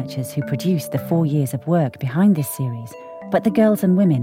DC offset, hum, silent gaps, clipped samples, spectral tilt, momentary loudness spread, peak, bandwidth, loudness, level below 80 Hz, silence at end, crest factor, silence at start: under 0.1%; none; none; under 0.1%; -7.5 dB/octave; 10 LU; -4 dBFS; 16.5 kHz; -19 LUFS; -64 dBFS; 0 s; 14 dB; 0 s